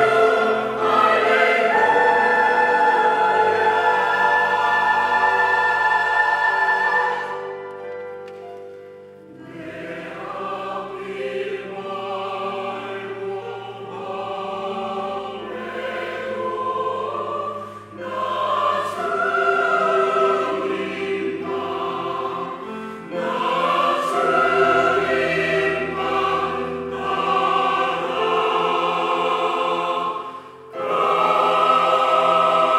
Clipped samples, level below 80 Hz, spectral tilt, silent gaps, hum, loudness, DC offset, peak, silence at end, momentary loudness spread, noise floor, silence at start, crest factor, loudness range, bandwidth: under 0.1%; -64 dBFS; -4.5 dB/octave; none; none; -20 LUFS; under 0.1%; -4 dBFS; 0 s; 15 LU; -41 dBFS; 0 s; 16 dB; 12 LU; 14.5 kHz